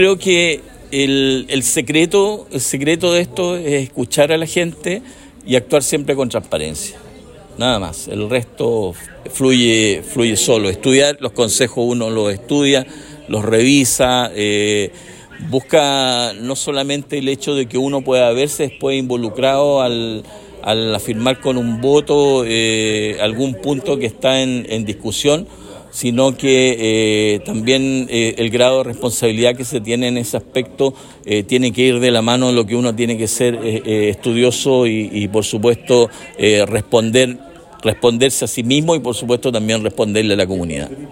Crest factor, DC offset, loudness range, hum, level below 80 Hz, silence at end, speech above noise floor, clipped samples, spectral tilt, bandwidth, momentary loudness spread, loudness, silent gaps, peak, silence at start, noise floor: 16 dB; under 0.1%; 3 LU; none; -46 dBFS; 0 s; 23 dB; under 0.1%; -4 dB/octave; 16.5 kHz; 8 LU; -16 LUFS; none; 0 dBFS; 0 s; -38 dBFS